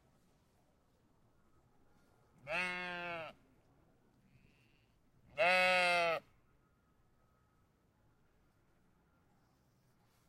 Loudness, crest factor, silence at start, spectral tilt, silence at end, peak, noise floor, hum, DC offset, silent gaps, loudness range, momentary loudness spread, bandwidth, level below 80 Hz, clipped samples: -34 LUFS; 22 dB; 2.45 s; -3 dB/octave; 4.1 s; -20 dBFS; -74 dBFS; none; under 0.1%; none; 9 LU; 17 LU; 16 kHz; -76 dBFS; under 0.1%